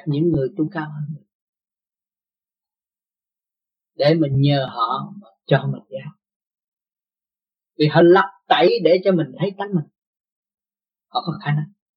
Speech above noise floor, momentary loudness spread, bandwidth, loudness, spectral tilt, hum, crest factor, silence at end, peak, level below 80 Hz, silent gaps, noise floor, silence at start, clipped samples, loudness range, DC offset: over 72 dB; 17 LU; 5.6 kHz; -19 LUFS; -9 dB/octave; none; 20 dB; 0.3 s; -2 dBFS; -60 dBFS; 1.35-1.53 s, 6.36-6.40 s, 6.68-6.72 s, 9.98-10.13 s, 10.20-10.24 s, 10.32-10.43 s; under -90 dBFS; 0.05 s; under 0.1%; 10 LU; under 0.1%